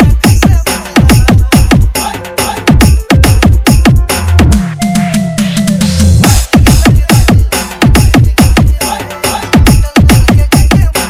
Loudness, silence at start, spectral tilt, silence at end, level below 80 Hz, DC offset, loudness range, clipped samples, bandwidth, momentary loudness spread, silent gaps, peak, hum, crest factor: -8 LUFS; 0 s; -5 dB/octave; 0 s; -12 dBFS; under 0.1%; 1 LU; 4%; 16.5 kHz; 6 LU; none; 0 dBFS; none; 6 dB